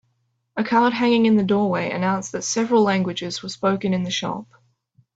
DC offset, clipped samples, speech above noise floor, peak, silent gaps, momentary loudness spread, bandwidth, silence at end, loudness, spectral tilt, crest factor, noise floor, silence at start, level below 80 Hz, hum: under 0.1%; under 0.1%; 50 dB; -6 dBFS; none; 10 LU; 8 kHz; 0.75 s; -21 LUFS; -5 dB/octave; 16 dB; -70 dBFS; 0.55 s; -62 dBFS; none